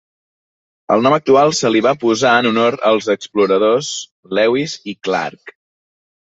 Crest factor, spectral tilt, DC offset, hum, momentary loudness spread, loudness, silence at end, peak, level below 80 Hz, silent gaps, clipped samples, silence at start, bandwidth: 16 dB; -4 dB/octave; under 0.1%; none; 11 LU; -15 LUFS; 0.9 s; -2 dBFS; -60 dBFS; 4.11-4.23 s; under 0.1%; 0.9 s; 8 kHz